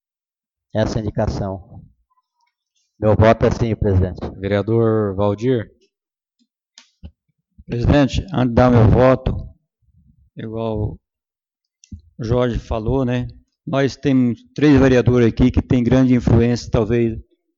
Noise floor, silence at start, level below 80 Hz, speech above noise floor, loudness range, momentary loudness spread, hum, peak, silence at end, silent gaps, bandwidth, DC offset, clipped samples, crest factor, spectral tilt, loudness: under -90 dBFS; 0.75 s; -32 dBFS; over 74 dB; 8 LU; 14 LU; none; 0 dBFS; 0.35 s; none; 7.4 kHz; under 0.1%; under 0.1%; 18 dB; -8 dB/octave; -17 LUFS